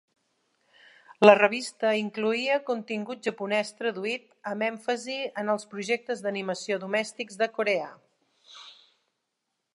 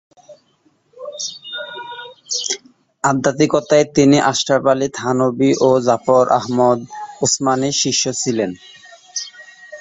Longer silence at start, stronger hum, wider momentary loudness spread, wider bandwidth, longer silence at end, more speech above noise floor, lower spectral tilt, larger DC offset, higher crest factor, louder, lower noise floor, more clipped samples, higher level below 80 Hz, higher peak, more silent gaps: first, 1.1 s vs 0.3 s; neither; second, 13 LU vs 17 LU; first, 11.5 kHz vs 8.4 kHz; first, 1 s vs 0 s; first, 55 dB vs 44 dB; about the same, -4 dB/octave vs -4 dB/octave; neither; first, 26 dB vs 18 dB; second, -27 LUFS vs -16 LUFS; first, -81 dBFS vs -59 dBFS; neither; second, -84 dBFS vs -58 dBFS; about the same, -2 dBFS vs 0 dBFS; neither